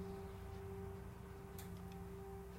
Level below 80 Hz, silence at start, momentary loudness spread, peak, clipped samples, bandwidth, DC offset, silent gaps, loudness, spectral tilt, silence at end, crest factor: -58 dBFS; 0 s; 3 LU; -36 dBFS; under 0.1%; 16 kHz; under 0.1%; none; -52 LUFS; -6.5 dB/octave; 0 s; 14 dB